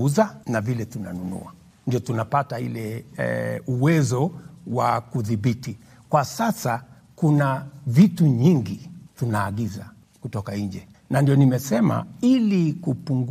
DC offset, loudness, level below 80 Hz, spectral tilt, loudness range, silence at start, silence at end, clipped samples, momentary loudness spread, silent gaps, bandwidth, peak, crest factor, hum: under 0.1%; -23 LUFS; -60 dBFS; -7 dB/octave; 4 LU; 0 s; 0 s; under 0.1%; 14 LU; none; 15.5 kHz; -4 dBFS; 18 dB; none